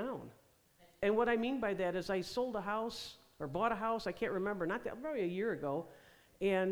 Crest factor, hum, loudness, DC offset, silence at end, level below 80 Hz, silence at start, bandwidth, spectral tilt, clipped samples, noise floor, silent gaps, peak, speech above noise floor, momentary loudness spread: 16 dB; none; -37 LUFS; under 0.1%; 0 s; -64 dBFS; 0 s; over 20 kHz; -6 dB/octave; under 0.1%; -67 dBFS; none; -20 dBFS; 31 dB; 11 LU